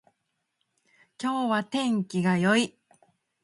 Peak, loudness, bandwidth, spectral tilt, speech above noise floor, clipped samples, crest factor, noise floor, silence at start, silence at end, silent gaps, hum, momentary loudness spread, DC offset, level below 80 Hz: -10 dBFS; -26 LUFS; 11.5 kHz; -5.5 dB/octave; 54 dB; under 0.1%; 20 dB; -79 dBFS; 1.2 s; 0.75 s; none; none; 9 LU; under 0.1%; -72 dBFS